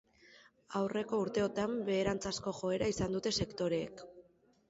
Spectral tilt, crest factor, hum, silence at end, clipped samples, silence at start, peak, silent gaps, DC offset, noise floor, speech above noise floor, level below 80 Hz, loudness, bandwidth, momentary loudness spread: -4.5 dB/octave; 16 dB; none; 0.5 s; under 0.1%; 0.3 s; -20 dBFS; none; under 0.1%; -65 dBFS; 30 dB; -60 dBFS; -36 LUFS; 8 kHz; 6 LU